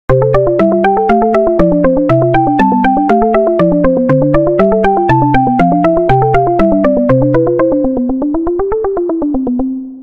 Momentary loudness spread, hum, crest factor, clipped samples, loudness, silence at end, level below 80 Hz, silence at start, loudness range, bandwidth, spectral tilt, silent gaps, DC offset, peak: 5 LU; none; 10 dB; under 0.1%; -11 LUFS; 0 s; -28 dBFS; 0.1 s; 2 LU; 6.8 kHz; -9.5 dB/octave; none; under 0.1%; 0 dBFS